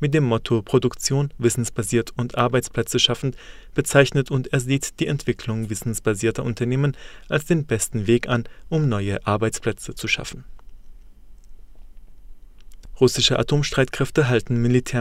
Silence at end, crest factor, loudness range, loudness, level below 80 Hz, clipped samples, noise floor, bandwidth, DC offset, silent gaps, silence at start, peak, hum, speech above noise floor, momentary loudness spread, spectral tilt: 0 s; 20 dB; 6 LU; -22 LUFS; -42 dBFS; under 0.1%; -42 dBFS; 16 kHz; under 0.1%; none; 0 s; -2 dBFS; none; 21 dB; 8 LU; -5 dB/octave